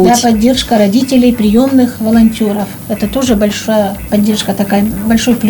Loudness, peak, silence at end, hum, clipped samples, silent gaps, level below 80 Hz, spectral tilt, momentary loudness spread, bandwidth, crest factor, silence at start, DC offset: -11 LUFS; 0 dBFS; 0 s; none; under 0.1%; none; -32 dBFS; -5 dB/octave; 6 LU; over 20 kHz; 10 dB; 0 s; under 0.1%